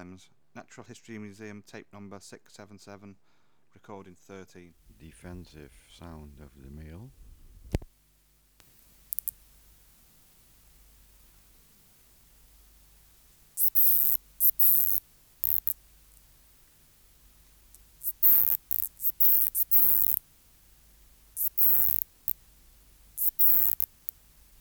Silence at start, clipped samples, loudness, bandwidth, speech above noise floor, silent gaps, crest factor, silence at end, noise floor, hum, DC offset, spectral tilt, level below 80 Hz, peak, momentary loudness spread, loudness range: 0 s; under 0.1%; -22 LUFS; over 20 kHz; 18 dB; none; 26 dB; 0.9 s; -65 dBFS; none; under 0.1%; -3 dB/octave; -54 dBFS; -4 dBFS; 27 LU; 23 LU